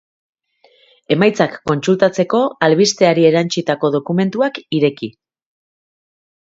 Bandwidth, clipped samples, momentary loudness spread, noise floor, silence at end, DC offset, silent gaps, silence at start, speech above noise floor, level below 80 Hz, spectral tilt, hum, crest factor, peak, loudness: 7.8 kHz; under 0.1%; 7 LU; -54 dBFS; 1.35 s; under 0.1%; none; 1.1 s; 39 dB; -60 dBFS; -5.5 dB/octave; none; 16 dB; 0 dBFS; -15 LUFS